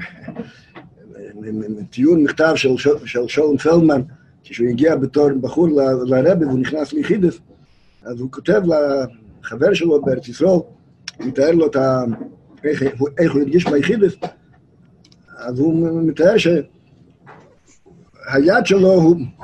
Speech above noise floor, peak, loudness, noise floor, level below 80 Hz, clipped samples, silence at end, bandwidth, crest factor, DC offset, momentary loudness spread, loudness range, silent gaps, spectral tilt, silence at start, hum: 36 dB; -2 dBFS; -16 LUFS; -52 dBFS; -52 dBFS; under 0.1%; 0.1 s; 9 kHz; 16 dB; under 0.1%; 18 LU; 3 LU; none; -7 dB/octave; 0 s; none